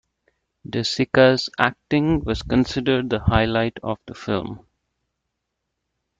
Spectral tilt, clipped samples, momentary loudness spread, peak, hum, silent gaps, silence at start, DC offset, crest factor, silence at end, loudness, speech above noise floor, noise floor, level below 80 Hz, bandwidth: -6 dB/octave; under 0.1%; 14 LU; 0 dBFS; none; none; 0.7 s; under 0.1%; 22 dB; 1.6 s; -21 LUFS; 58 dB; -79 dBFS; -40 dBFS; 8.8 kHz